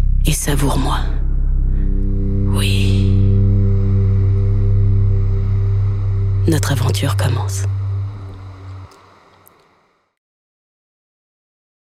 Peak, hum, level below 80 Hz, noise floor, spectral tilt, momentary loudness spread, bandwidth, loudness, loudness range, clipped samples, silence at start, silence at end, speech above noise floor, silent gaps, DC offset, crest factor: -2 dBFS; none; -20 dBFS; -58 dBFS; -6 dB/octave; 9 LU; 14.5 kHz; -17 LUFS; 9 LU; under 0.1%; 0 s; 3.05 s; 43 dB; none; under 0.1%; 14 dB